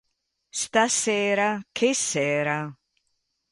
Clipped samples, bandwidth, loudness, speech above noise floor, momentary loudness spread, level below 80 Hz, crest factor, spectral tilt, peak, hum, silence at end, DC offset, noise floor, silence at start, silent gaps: under 0.1%; 11.5 kHz; -24 LUFS; 52 dB; 9 LU; -70 dBFS; 18 dB; -2.5 dB/octave; -8 dBFS; none; 0.8 s; under 0.1%; -76 dBFS; 0.55 s; none